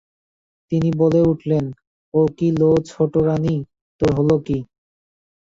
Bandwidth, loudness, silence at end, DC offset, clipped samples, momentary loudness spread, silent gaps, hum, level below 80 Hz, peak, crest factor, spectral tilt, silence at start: 7.8 kHz; -19 LUFS; 0.85 s; under 0.1%; under 0.1%; 10 LU; 1.87-2.12 s, 3.81-3.99 s; none; -46 dBFS; -4 dBFS; 16 dB; -9 dB/octave; 0.7 s